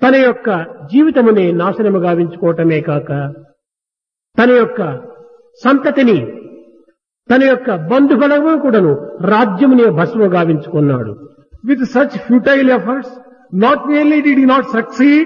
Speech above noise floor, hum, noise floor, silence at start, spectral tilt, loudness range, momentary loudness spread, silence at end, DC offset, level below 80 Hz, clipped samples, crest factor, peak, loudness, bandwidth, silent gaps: 75 dB; none; -86 dBFS; 0 s; -8.5 dB/octave; 4 LU; 10 LU; 0 s; under 0.1%; -56 dBFS; under 0.1%; 12 dB; 0 dBFS; -12 LUFS; 7 kHz; none